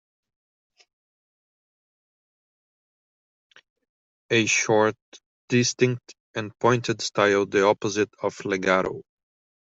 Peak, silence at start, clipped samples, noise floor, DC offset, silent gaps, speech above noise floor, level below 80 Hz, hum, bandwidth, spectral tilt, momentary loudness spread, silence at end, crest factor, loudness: -4 dBFS; 4.3 s; under 0.1%; under -90 dBFS; under 0.1%; 5.02-5.12 s, 5.26-5.48 s, 6.20-6.34 s; over 67 dB; -66 dBFS; none; 8 kHz; -4 dB/octave; 12 LU; 0.7 s; 22 dB; -23 LUFS